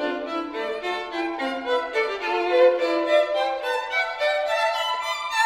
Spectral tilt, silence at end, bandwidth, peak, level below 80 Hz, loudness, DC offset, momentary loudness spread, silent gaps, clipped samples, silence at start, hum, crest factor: -1.5 dB/octave; 0 s; 16 kHz; -8 dBFS; -64 dBFS; -23 LUFS; under 0.1%; 9 LU; none; under 0.1%; 0 s; none; 16 dB